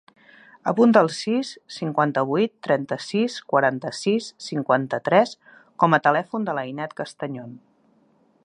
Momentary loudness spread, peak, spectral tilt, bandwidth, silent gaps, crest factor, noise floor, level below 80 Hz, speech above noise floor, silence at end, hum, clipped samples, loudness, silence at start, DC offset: 13 LU; -2 dBFS; -5.5 dB/octave; 10.5 kHz; none; 22 dB; -61 dBFS; -74 dBFS; 39 dB; 0.85 s; none; under 0.1%; -22 LUFS; 0.65 s; under 0.1%